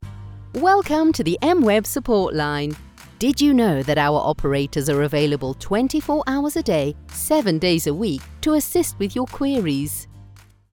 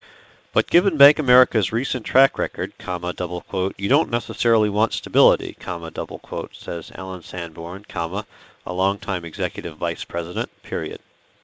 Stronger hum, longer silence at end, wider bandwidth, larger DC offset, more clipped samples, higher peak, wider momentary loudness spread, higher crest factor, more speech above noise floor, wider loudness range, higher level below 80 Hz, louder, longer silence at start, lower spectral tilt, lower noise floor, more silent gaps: neither; about the same, 0.4 s vs 0.45 s; first, 19 kHz vs 8 kHz; neither; neither; second, -6 dBFS vs 0 dBFS; second, 9 LU vs 14 LU; second, 14 dB vs 22 dB; about the same, 27 dB vs 29 dB; second, 2 LU vs 8 LU; first, -40 dBFS vs -48 dBFS; about the same, -20 LUFS vs -22 LUFS; second, 0 s vs 0.55 s; about the same, -5 dB/octave vs -5.5 dB/octave; about the same, -47 dBFS vs -50 dBFS; neither